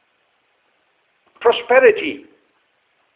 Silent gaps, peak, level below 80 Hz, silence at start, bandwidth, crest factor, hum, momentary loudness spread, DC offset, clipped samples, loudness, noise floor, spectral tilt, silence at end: none; 0 dBFS; -64 dBFS; 1.4 s; 4 kHz; 20 dB; none; 14 LU; under 0.1%; under 0.1%; -15 LUFS; -64 dBFS; -7 dB/octave; 0.95 s